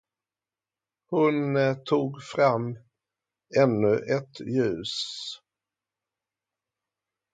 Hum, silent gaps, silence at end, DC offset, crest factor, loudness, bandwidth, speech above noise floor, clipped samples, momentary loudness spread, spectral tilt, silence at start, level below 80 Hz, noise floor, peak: none; none; 1.95 s; under 0.1%; 20 dB; -26 LUFS; 9.2 kHz; over 65 dB; under 0.1%; 12 LU; -6 dB/octave; 1.1 s; -68 dBFS; under -90 dBFS; -8 dBFS